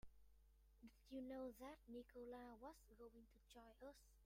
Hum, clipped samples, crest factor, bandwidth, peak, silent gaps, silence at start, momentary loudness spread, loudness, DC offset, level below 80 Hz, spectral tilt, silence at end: none; under 0.1%; 16 dB; 16 kHz; -44 dBFS; none; 0.05 s; 13 LU; -60 LUFS; under 0.1%; -74 dBFS; -5.5 dB/octave; 0 s